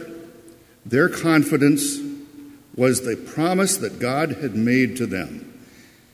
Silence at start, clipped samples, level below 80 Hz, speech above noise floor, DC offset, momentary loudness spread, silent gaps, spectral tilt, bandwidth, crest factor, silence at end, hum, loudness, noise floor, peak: 0 s; under 0.1%; -56 dBFS; 29 dB; under 0.1%; 18 LU; none; -5 dB/octave; 16 kHz; 18 dB; 0.55 s; none; -21 LUFS; -49 dBFS; -4 dBFS